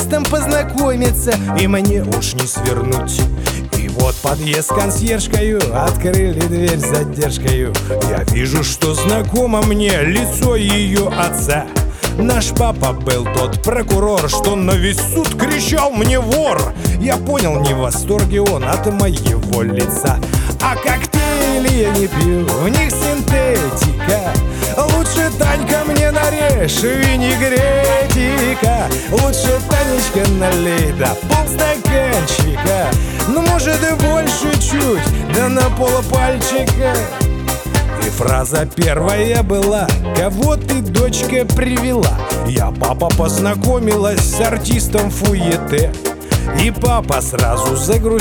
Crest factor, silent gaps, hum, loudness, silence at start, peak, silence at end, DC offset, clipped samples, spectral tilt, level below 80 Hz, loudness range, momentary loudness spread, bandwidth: 14 dB; none; none; -15 LUFS; 0 s; 0 dBFS; 0 s; under 0.1%; under 0.1%; -5 dB/octave; -22 dBFS; 2 LU; 3 LU; over 20 kHz